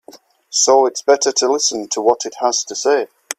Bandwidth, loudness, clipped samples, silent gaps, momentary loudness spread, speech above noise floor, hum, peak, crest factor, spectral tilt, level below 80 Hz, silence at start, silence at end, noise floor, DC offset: 14.5 kHz; -16 LUFS; under 0.1%; none; 6 LU; 29 dB; none; 0 dBFS; 16 dB; 0 dB/octave; -66 dBFS; 0.15 s; 0.05 s; -45 dBFS; under 0.1%